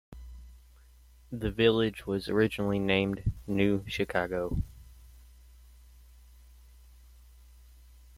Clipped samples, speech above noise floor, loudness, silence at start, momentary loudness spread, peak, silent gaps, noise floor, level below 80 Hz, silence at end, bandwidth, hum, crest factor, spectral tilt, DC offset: under 0.1%; 28 dB; -30 LUFS; 0.1 s; 18 LU; -10 dBFS; none; -57 dBFS; -46 dBFS; 2.95 s; 16 kHz; none; 22 dB; -6.5 dB/octave; under 0.1%